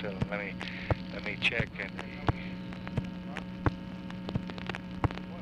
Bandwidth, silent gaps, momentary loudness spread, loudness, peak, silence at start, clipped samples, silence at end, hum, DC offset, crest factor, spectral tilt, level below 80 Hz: 10.5 kHz; none; 10 LU; -35 LUFS; -10 dBFS; 0 s; under 0.1%; 0 s; none; under 0.1%; 26 dB; -6.5 dB/octave; -48 dBFS